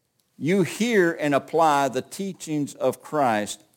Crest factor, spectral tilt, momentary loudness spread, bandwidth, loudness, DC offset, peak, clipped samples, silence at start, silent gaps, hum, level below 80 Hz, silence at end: 16 dB; -5 dB/octave; 9 LU; 17 kHz; -23 LUFS; under 0.1%; -8 dBFS; under 0.1%; 0.4 s; none; none; -74 dBFS; 0.2 s